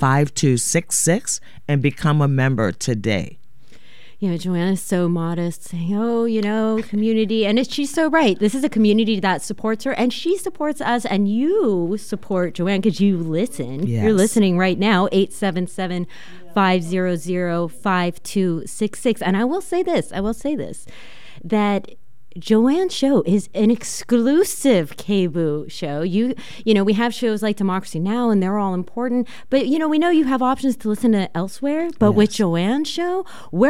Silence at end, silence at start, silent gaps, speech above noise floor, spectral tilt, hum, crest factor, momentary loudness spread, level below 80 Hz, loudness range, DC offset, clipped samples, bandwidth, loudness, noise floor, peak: 0 s; 0 s; none; 33 dB; -5.5 dB/octave; none; 16 dB; 8 LU; -52 dBFS; 4 LU; 2%; under 0.1%; 16 kHz; -20 LUFS; -52 dBFS; -4 dBFS